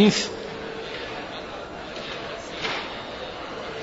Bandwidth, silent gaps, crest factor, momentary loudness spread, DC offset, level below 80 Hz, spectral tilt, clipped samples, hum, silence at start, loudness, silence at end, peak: 8 kHz; none; 22 dB; 7 LU; under 0.1%; -52 dBFS; -4 dB/octave; under 0.1%; none; 0 s; -30 LUFS; 0 s; -6 dBFS